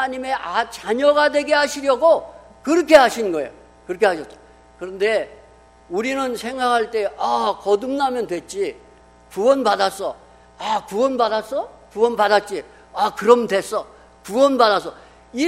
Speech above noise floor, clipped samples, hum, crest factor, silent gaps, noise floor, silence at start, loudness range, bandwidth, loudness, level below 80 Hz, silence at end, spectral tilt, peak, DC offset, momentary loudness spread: 30 dB; under 0.1%; 60 Hz at -55 dBFS; 20 dB; none; -48 dBFS; 0 s; 6 LU; 16 kHz; -19 LUFS; -54 dBFS; 0 s; -3.5 dB/octave; 0 dBFS; under 0.1%; 15 LU